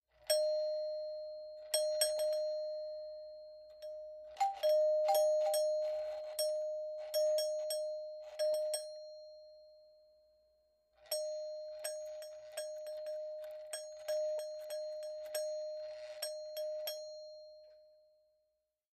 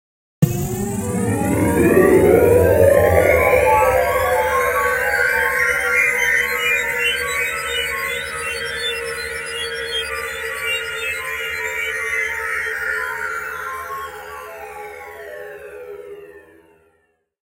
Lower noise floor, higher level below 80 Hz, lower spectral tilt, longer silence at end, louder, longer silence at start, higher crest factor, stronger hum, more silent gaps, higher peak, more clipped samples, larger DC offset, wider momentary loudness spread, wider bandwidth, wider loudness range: first, -84 dBFS vs -64 dBFS; second, -82 dBFS vs -38 dBFS; second, 2 dB/octave vs -4.5 dB/octave; about the same, 1.1 s vs 1.05 s; second, -38 LUFS vs -17 LUFS; second, 0.2 s vs 0.4 s; about the same, 20 dB vs 18 dB; first, 60 Hz at -90 dBFS vs none; neither; second, -20 dBFS vs 0 dBFS; neither; neither; second, 17 LU vs 20 LU; about the same, 15.5 kHz vs 16 kHz; second, 10 LU vs 14 LU